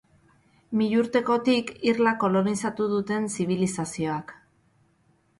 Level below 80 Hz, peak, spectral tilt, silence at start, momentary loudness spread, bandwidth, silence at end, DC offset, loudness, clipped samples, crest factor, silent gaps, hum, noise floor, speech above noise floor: -64 dBFS; -10 dBFS; -5.5 dB/octave; 0.7 s; 7 LU; 11.5 kHz; 1.05 s; under 0.1%; -25 LUFS; under 0.1%; 16 dB; none; none; -65 dBFS; 41 dB